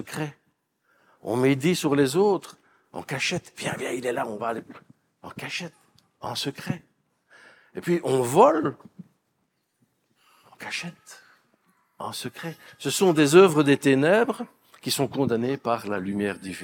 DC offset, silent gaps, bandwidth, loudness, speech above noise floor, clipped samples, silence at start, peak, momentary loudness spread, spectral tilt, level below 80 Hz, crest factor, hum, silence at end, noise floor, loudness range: under 0.1%; none; 19 kHz; -24 LUFS; 50 dB; under 0.1%; 0 s; -2 dBFS; 20 LU; -5 dB/octave; -72 dBFS; 24 dB; none; 0 s; -74 dBFS; 15 LU